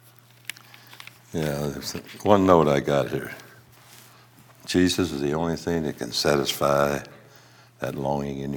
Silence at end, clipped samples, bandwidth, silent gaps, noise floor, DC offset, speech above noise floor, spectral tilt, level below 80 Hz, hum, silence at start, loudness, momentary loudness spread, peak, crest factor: 0 s; under 0.1%; 18 kHz; none; -52 dBFS; under 0.1%; 29 dB; -5 dB/octave; -52 dBFS; none; 0.9 s; -24 LUFS; 20 LU; -2 dBFS; 24 dB